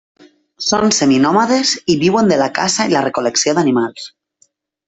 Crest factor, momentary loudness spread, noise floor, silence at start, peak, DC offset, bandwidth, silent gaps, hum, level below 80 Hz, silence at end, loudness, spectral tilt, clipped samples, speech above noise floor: 14 dB; 7 LU; -58 dBFS; 0.6 s; -2 dBFS; under 0.1%; 8.4 kHz; none; none; -54 dBFS; 0.8 s; -14 LUFS; -3.5 dB/octave; under 0.1%; 44 dB